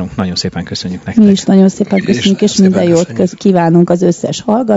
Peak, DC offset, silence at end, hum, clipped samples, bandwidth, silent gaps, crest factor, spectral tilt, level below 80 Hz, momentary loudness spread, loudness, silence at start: 0 dBFS; under 0.1%; 0 s; none; 0.9%; 8 kHz; none; 10 dB; -6 dB/octave; -44 dBFS; 8 LU; -11 LUFS; 0 s